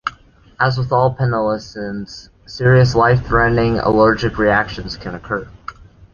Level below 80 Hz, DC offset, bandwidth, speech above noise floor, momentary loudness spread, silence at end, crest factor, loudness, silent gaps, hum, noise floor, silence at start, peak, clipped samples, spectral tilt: -36 dBFS; under 0.1%; 7 kHz; 30 dB; 19 LU; 0.4 s; 16 dB; -16 LUFS; none; none; -45 dBFS; 0.05 s; -2 dBFS; under 0.1%; -7 dB/octave